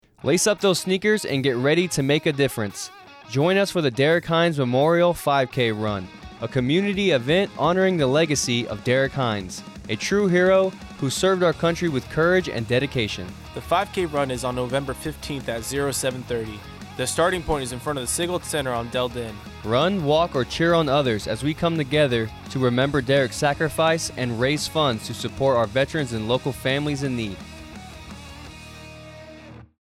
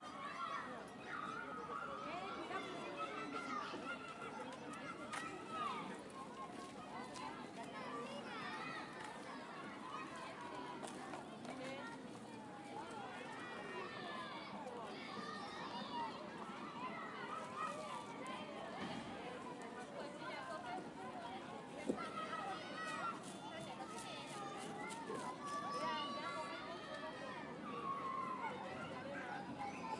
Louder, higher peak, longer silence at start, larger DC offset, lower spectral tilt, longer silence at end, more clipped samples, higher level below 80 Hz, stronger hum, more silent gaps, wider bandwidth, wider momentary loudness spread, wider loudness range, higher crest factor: first, -22 LUFS vs -47 LUFS; first, -8 dBFS vs -26 dBFS; first, 0.25 s vs 0 s; neither; about the same, -4.5 dB/octave vs -4 dB/octave; first, 0.2 s vs 0 s; neither; first, -46 dBFS vs -80 dBFS; neither; neither; first, 16 kHz vs 11.5 kHz; first, 15 LU vs 6 LU; about the same, 5 LU vs 4 LU; second, 14 dB vs 22 dB